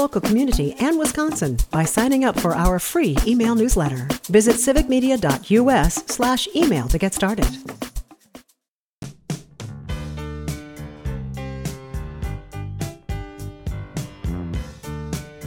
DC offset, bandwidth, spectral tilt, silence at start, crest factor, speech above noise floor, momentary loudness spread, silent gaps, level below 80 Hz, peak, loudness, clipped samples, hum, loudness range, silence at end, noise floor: under 0.1%; 19.5 kHz; -5 dB/octave; 0 s; 18 dB; 60 dB; 16 LU; 8.68-9.02 s; -30 dBFS; -2 dBFS; -21 LUFS; under 0.1%; none; 14 LU; 0 s; -78 dBFS